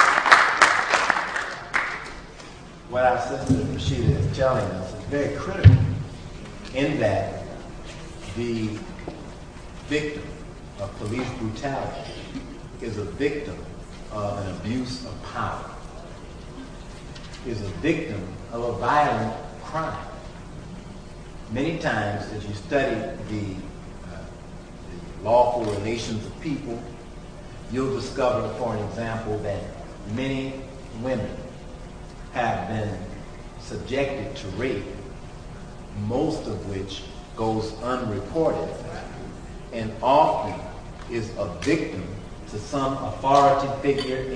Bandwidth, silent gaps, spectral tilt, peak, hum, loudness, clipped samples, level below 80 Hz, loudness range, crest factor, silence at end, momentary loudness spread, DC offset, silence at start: 10.5 kHz; none; -6 dB/octave; 0 dBFS; none; -25 LUFS; under 0.1%; -40 dBFS; 9 LU; 26 dB; 0 s; 20 LU; under 0.1%; 0 s